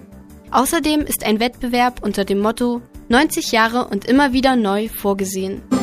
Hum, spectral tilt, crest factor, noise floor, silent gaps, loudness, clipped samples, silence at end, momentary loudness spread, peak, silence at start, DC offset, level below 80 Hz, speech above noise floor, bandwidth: none; -4 dB/octave; 18 dB; -40 dBFS; none; -18 LUFS; under 0.1%; 0 s; 6 LU; 0 dBFS; 0.1 s; under 0.1%; -40 dBFS; 23 dB; 15.5 kHz